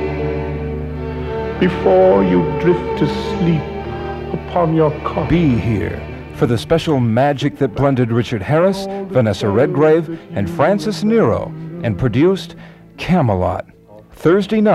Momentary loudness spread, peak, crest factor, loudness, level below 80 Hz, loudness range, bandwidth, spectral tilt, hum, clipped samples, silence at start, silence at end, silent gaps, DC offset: 11 LU; -2 dBFS; 14 dB; -16 LUFS; -36 dBFS; 2 LU; 13.5 kHz; -7.5 dB/octave; none; under 0.1%; 0 s; 0 s; none; under 0.1%